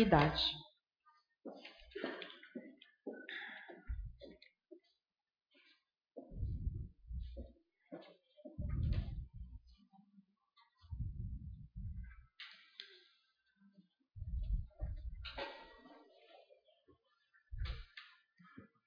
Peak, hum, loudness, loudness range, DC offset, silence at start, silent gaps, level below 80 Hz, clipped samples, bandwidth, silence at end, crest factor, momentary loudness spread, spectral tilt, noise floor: -16 dBFS; none; -44 LUFS; 7 LU; under 0.1%; 0 s; none; -50 dBFS; under 0.1%; 5.2 kHz; 0.2 s; 28 dB; 22 LU; -4 dB/octave; under -90 dBFS